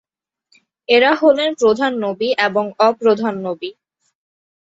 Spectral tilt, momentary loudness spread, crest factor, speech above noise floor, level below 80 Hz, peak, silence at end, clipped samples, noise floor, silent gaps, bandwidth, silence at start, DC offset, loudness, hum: -4.5 dB/octave; 13 LU; 18 dB; 48 dB; -64 dBFS; 0 dBFS; 1.05 s; under 0.1%; -64 dBFS; none; 7.8 kHz; 0.9 s; under 0.1%; -16 LUFS; none